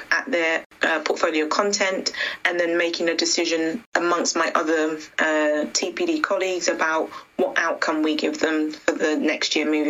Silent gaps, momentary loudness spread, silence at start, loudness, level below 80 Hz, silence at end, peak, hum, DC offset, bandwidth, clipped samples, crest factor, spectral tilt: 0.66-0.70 s, 3.86-3.92 s; 4 LU; 0 s; -22 LUFS; -68 dBFS; 0 s; -4 dBFS; none; under 0.1%; 13.5 kHz; under 0.1%; 18 dB; -1.5 dB/octave